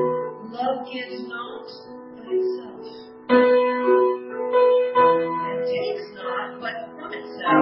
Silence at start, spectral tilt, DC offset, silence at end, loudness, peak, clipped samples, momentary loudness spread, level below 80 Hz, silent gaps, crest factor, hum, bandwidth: 0 s; -9.5 dB/octave; under 0.1%; 0 s; -22 LUFS; -4 dBFS; under 0.1%; 20 LU; -70 dBFS; none; 18 dB; none; 5.8 kHz